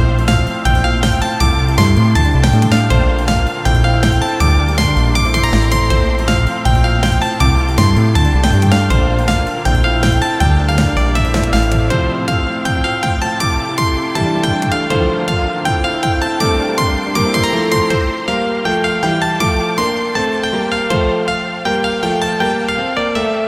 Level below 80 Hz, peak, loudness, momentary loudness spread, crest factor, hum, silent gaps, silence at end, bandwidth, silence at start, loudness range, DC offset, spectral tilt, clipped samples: -20 dBFS; 0 dBFS; -15 LUFS; 5 LU; 14 dB; none; none; 0 s; 15.5 kHz; 0 s; 3 LU; under 0.1%; -5.5 dB/octave; under 0.1%